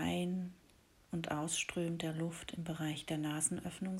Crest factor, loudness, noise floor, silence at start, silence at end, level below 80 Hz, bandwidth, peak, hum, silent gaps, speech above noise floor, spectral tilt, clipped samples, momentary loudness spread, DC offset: 20 dB; -39 LUFS; -67 dBFS; 0 s; 0 s; -66 dBFS; 16.5 kHz; -20 dBFS; none; none; 27 dB; -4 dB/octave; under 0.1%; 8 LU; under 0.1%